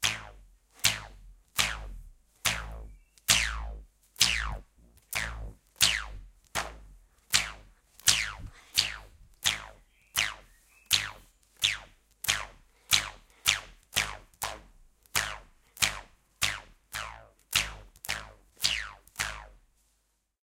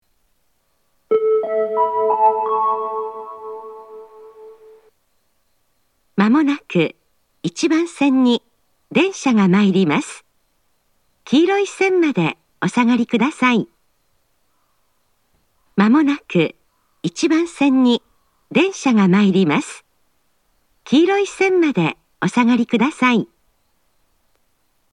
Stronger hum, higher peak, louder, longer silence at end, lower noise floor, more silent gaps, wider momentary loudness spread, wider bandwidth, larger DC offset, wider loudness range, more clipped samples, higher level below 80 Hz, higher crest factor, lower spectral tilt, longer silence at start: neither; about the same, -4 dBFS vs -2 dBFS; second, -29 LUFS vs -17 LUFS; second, 0.85 s vs 1.65 s; first, -75 dBFS vs -67 dBFS; neither; first, 20 LU vs 14 LU; first, 17 kHz vs 11 kHz; neither; about the same, 4 LU vs 5 LU; neither; first, -48 dBFS vs -66 dBFS; first, 30 dB vs 18 dB; second, 0.5 dB/octave vs -6 dB/octave; second, 0 s vs 1.1 s